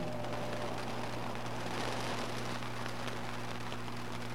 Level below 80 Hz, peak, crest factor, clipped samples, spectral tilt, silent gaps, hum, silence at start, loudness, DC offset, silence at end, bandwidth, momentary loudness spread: -56 dBFS; -20 dBFS; 20 dB; under 0.1%; -4.5 dB/octave; none; 60 Hz at -45 dBFS; 0 s; -40 LUFS; 0.9%; 0 s; 16 kHz; 4 LU